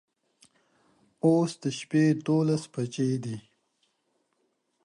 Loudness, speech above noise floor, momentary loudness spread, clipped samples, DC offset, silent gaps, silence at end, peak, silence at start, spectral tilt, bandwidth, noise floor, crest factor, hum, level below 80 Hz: -27 LUFS; 49 dB; 10 LU; under 0.1%; under 0.1%; none; 1.45 s; -12 dBFS; 1.25 s; -7 dB/octave; 11.5 kHz; -75 dBFS; 18 dB; none; -74 dBFS